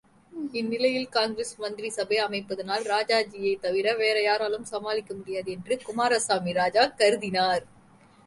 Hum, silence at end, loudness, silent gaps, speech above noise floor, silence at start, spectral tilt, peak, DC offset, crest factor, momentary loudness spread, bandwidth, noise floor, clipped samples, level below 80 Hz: none; 0.6 s; -26 LUFS; none; 29 dB; 0.35 s; -3 dB/octave; -8 dBFS; under 0.1%; 18 dB; 10 LU; 11.5 kHz; -56 dBFS; under 0.1%; -66 dBFS